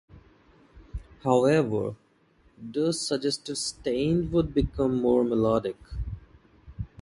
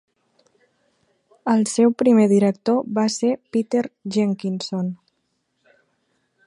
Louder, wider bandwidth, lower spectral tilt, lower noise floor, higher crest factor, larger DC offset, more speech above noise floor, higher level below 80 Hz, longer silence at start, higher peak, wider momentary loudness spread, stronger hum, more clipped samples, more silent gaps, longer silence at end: second, -26 LUFS vs -20 LUFS; about the same, 11.5 kHz vs 11 kHz; about the same, -5.5 dB/octave vs -6 dB/octave; second, -62 dBFS vs -72 dBFS; about the same, 20 dB vs 16 dB; neither; second, 37 dB vs 53 dB; first, -44 dBFS vs -72 dBFS; second, 0.15 s vs 1.45 s; about the same, -6 dBFS vs -6 dBFS; first, 18 LU vs 11 LU; neither; neither; neither; second, 0.15 s vs 1.5 s